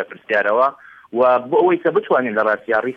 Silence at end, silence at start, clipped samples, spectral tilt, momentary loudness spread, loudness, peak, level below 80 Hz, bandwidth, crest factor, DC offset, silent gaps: 0 s; 0 s; under 0.1%; -7.5 dB/octave; 4 LU; -17 LUFS; -4 dBFS; -68 dBFS; 5.6 kHz; 14 dB; under 0.1%; none